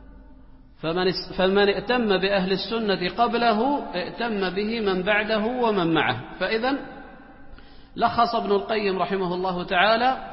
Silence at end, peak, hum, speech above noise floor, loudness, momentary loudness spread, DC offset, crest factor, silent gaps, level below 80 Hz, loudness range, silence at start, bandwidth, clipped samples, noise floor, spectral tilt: 0 s; -4 dBFS; none; 24 dB; -23 LUFS; 7 LU; under 0.1%; 18 dB; none; -48 dBFS; 3 LU; 0 s; 5.8 kHz; under 0.1%; -47 dBFS; -9.5 dB/octave